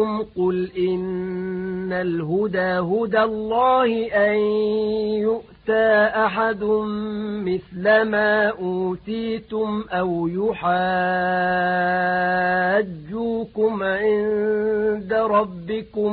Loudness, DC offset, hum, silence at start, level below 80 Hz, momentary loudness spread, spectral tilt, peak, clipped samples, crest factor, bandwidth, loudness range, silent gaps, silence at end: -21 LUFS; under 0.1%; none; 0 s; -52 dBFS; 9 LU; -11 dB/octave; -6 dBFS; under 0.1%; 16 dB; 4.7 kHz; 2 LU; none; 0 s